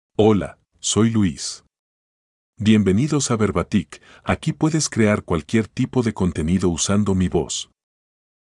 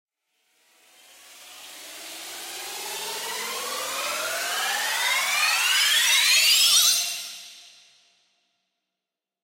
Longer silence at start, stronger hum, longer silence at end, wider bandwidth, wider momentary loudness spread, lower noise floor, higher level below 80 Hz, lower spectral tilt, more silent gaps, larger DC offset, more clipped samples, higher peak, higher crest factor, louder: second, 0.2 s vs 1.3 s; neither; second, 0.95 s vs 1.8 s; second, 11 kHz vs 16 kHz; second, 10 LU vs 21 LU; about the same, under -90 dBFS vs -88 dBFS; first, -46 dBFS vs -82 dBFS; first, -5.5 dB/octave vs 3.5 dB/octave; first, 1.79-2.53 s vs none; neither; neither; first, -2 dBFS vs -6 dBFS; about the same, 18 dB vs 20 dB; about the same, -20 LUFS vs -20 LUFS